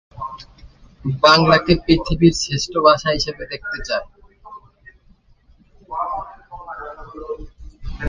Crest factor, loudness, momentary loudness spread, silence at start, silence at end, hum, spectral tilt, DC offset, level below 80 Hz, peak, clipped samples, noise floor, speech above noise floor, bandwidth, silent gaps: 20 dB; -17 LUFS; 22 LU; 0.15 s; 0 s; none; -5 dB/octave; under 0.1%; -38 dBFS; 0 dBFS; under 0.1%; -53 dBFS; 37 dB; 9.8 kHz; none